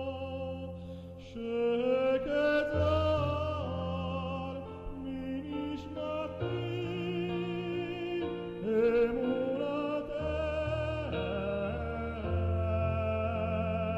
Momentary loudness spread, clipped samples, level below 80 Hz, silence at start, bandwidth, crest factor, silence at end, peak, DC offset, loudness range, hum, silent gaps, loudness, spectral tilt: 10 LU; under 0.1%; -48 dBFS; 0 s; 7.8 kHz; 14 dB; 0 s; -18 dBFS; under 0.1%; 6 LU; none; none; -33 LUFS; -8 dB/octave